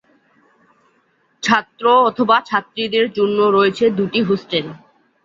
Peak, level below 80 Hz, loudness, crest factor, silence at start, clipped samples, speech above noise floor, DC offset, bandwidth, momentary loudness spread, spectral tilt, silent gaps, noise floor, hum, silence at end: -2 dBFS; -60 dBFS; -16 LUFS; 16 dB; 1.45 s; under 0.1%; 45 dB; under 0.1%; 7.6 kHz; 8 LU; -5 dB/octave; none; -61 dBFS; none; 0.5 s